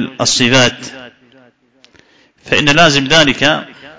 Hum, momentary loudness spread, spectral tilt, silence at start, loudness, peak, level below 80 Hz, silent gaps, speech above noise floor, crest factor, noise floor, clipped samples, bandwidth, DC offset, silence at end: none; 11 LU; -3 dB/octave; 0 s; -10 LUFS; 0 dBFS; -44 dBFS; none; 39 dB; 14 dB; -50 dBFS; 0.2%; 8 kHz; under 0.1%; 0.05 s